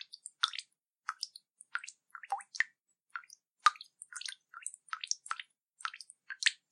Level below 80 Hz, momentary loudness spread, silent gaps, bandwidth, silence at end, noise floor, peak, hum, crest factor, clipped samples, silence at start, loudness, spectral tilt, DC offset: under -90 dBFS; 17 LU; none; 13 kHz; 0.15 s; -68 dBFS; -6 dBFS; none; 34 dB; under 0.1%; 0 s; -37 LUFS; 7 dB/octave; under 0.1%